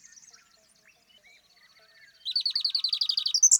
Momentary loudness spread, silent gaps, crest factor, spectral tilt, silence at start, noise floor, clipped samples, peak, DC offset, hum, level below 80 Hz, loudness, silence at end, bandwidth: 7 LU; none; 22 dB; 6.5 dB/octave; 2.25 s; -62 dBFS; under 0.1%; -8 dBFS; under 0.1%; none; -84 dBFS; -25 LUFS; 0 s; 19.5 kHz